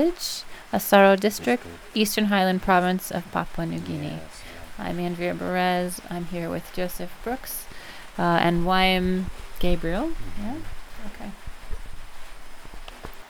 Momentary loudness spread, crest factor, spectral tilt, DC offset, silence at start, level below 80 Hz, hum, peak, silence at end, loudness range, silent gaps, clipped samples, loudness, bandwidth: 21 LU; 20 dB; -5 dB/octave; under 0.1%; 0 s; -38 dBFS; none; -4 dBFS; 0 s; 11 LU; none; under 0.1%; -24 LUFS; over 20 kHz